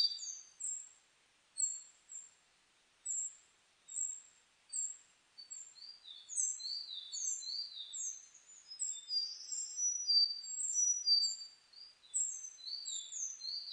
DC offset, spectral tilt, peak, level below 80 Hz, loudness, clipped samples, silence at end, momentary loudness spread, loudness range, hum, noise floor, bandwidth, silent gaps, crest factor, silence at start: under 0.1%; 6 dB/octave; -22 dBFS; under -90 dBFS; -36 LUFS; under 0.1%; 0 s; 22 LU; 10 LU; none; -72 dBFS; 10.5 kHz; none; 20 dB; 0 s